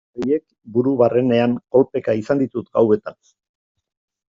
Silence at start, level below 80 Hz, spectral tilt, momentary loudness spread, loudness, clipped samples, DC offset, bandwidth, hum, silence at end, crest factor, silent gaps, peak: 0.15 s; -60 dBFS; -7 dB/octave; 6 LU; -19 LUFS; under 0.1%; under 0.1%; 7.6 kHz; none; 1.15 s; 16 dB; none; -4 dBFS